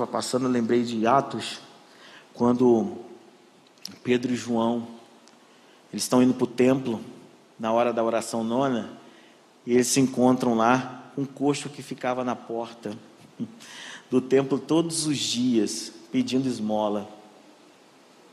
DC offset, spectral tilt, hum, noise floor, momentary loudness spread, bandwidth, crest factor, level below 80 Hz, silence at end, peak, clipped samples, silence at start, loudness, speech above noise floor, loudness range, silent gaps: under 0.1%; -4.5 dB/octave; none; -55 dBFS; 17 LU; 13.5 kHz; 20 dB; -70 dBFS; 1.1 s; -6 dBFS; under 0.1%; 0 s; -25 LUFS; 31 dB; 4 LU; none